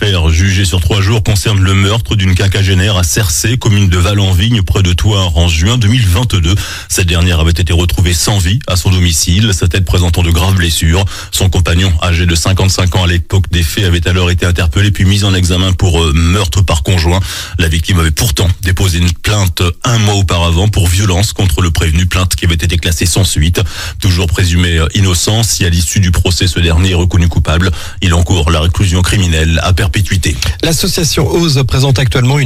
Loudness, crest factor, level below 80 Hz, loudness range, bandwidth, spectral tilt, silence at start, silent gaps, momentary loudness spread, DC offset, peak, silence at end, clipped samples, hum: -10 LUFS; 10 dB; -18 dBFS; 1 LU; 16 kHz; -4.5 dB/octave; 0 s; none; 3 LU; under 0.1%; 0 dBFS; 0 s; under 0.1%; none